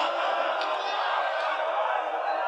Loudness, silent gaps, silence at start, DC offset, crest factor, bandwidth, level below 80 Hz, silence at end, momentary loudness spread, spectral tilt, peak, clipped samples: -27 LUFS; none; 0 s; under 0.1%; 14 dB; 10 kHz; under -90 dBFS; 0 s; 1 LU; 1 dB/octave; -14 dBFS; under 0.1%